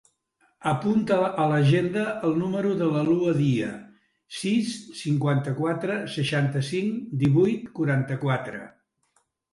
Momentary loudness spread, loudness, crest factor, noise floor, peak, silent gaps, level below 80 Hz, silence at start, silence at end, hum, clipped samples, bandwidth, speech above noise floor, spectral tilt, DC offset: 10 LU; -25 LUFS; 16 dB; -70 dBFS; -10 dBFS; none; -62 dBFS; 0.6 s; 0.85 s; none; under 0.1%; 11.5 kHz; 46 dB; -7 dB/octave; under 0.1%